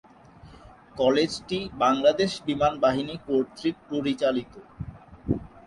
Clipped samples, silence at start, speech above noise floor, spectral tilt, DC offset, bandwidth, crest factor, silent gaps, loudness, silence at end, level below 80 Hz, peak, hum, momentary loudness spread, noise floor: under 0.1%; 0.45 s; 25 dB; -5.5 dB/octave; under 0.1%; 11.5 kHz; 20 dB; none; -25 LUFS; 0.1 s; -50 dBFS; -8 dBFS; none; 19 LU; -50 dBFS